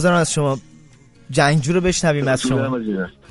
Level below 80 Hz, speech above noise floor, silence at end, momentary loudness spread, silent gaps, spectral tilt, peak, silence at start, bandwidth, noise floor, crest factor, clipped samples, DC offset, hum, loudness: -42 dBFS; 30 dB; 0.2 s; 8 LU; none; -5 dB/octave; -2 dBFS; 0 s; 11.5 kHz; -47 dBFS; 16 dB; under 0.1%; under 0.1%; none; -19 LUFS